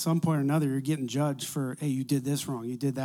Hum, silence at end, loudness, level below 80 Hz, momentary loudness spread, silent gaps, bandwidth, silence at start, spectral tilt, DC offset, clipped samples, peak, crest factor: none; 0 s; -29 LUFS; -72 dBFS; 6 LU; none; 17 kHz; 0 s; -6 dB/octave; under 0.1%; under 0.1%; -16 dBFS; 14 dB